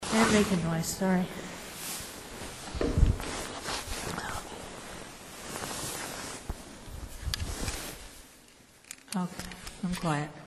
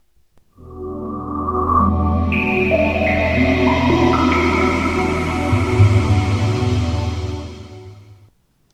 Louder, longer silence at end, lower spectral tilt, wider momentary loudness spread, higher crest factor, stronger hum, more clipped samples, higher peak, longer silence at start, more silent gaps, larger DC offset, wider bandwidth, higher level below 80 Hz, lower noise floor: second, -33 LUFS vs -17 LUFS; second, 0 s vs 0.6 s; second, -4.5 dB/octave vs -7 dB/octave; first, 16 LU vs 13 LU; first, 24 dB vs 16 dB; neither; neither; second, -8 dBFS vs -2 dBFS; second, 0 s vs 0.65 s; neither; neither; first, 13.5 kHz vs 11 kHz; second, -40 dBFS vs -30 dBFS; about the same, -56 dBFS vs -54 dBFS